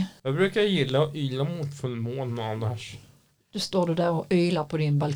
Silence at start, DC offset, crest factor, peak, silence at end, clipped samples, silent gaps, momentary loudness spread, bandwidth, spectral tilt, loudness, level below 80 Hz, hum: 0 s; under 0.1%; 16 dB; -10 dBFS; 0 s; under 0.1%; none; 9 LU; 16 kHz; -6.5 dB/octave; -26 LUFS; -62 dBFS; none